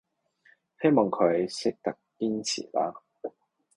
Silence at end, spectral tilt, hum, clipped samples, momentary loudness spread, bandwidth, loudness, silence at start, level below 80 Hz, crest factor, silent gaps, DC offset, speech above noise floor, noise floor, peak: 0.5 s; -5 dB/octave; none; under 0.1%; 18 LU; 11.5 kHz; -28 LUFS; 0.8 s; -70 dBFS; 20 dB; none; under 0.1%; 37 dB; -64 dBFS; -8 dBFS